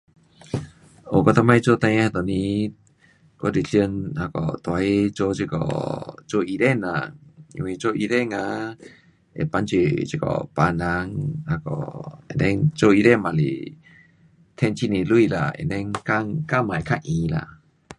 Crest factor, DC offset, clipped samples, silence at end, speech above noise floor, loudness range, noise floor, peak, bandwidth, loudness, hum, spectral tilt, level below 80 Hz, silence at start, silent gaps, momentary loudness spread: 22 dB; under 0.1%; under 0.1%; 0.05 s; 35 dB; 4 LU; -57 dBFS; -2 dBFS; 11 kHz; -22 LUFS; none; -7 dB/octave; -46 dBFS; 0.5 s; none; 14 LU